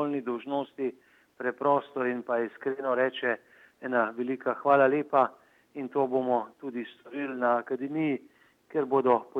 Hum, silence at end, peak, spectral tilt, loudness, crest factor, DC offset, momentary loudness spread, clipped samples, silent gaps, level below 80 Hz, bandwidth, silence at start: none; 0 s; -10 dBFS; -8 dB/octave; -29 LUFS; 20 dB; under 0.1%; 12 LU; under 0.1%; none; -84 dBFS; 4.9 kHz; 0 s